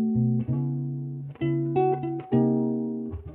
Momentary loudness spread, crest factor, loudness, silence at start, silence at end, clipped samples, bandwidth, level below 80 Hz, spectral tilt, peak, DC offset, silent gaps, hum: 9 LU; 14 dB; -27 LUFS; 0 s; 0 s; under 0.1%; 4 kHz; -52 dBFS; -13 dB/octave; -12 dBFS; under 0.1%; none; none